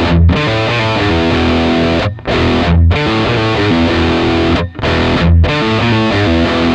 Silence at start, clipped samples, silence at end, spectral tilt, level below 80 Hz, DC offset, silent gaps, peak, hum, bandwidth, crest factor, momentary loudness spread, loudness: 0 s; under 0.1%; 0 s; -7 dB/octave; -20 dBFS; under 0.1%; none; 0 dBFS; none; 8.4 kHz; 10 dB; 3 LU; -12 LUFS